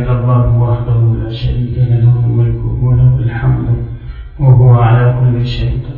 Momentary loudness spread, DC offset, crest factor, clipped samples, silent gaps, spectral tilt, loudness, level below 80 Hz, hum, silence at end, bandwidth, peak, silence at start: 9 LU; under 0.1%; 10 dB; under 0.1%; none; -10.5 dB/octave; -11 LUFS; -24 dBFS; none; 0 s; 4.7 kHz; 0 dBFS; 0 s